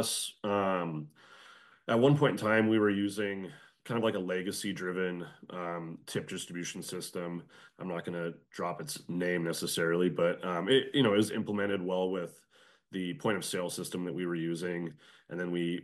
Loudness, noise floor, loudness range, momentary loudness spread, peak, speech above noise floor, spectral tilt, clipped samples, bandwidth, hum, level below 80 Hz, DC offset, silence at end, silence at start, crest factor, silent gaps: -32 LUFS; -57 dBFS; 9 LU; 14 LU; -14 dBFS; 25 dB; -5 dB/octave; under 0.1%; 12.5 kHz; none; -78 dBFS; under 0.1%; 0 s; 0 s; 20 dB; none